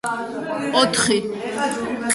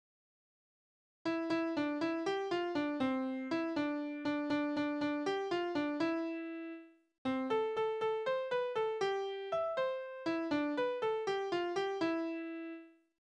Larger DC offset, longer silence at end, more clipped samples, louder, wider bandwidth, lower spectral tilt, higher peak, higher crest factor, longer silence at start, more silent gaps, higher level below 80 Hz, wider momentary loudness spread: neither; second, 0 s vs 0.35 s; neither; first, -21 LUFS vs -36 LUFS; first, 12 kHz vs 9.4 kHz; second, -2.5 dB/octave vs -5.5 dB/octave; first, -4 dBFS vs -22 dBFS; about the same, 18 dB vs 14 dB; second, 0.05 s vs 1.25 s; second, none vs 7.18-7.25 s; first, -56 dBFS vs -78 dBFS; first, 10 LU vs 6 LU